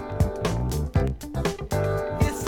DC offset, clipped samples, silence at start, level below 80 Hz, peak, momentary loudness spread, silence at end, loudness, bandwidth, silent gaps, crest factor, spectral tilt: under 0.1%; under 0.1%; 0 s; -32 dBFS; -8 dBFS; 4 LU; 0 s; -27 LUFS; 19.5 kHz; none; 16 dB; -6.5 dB/octave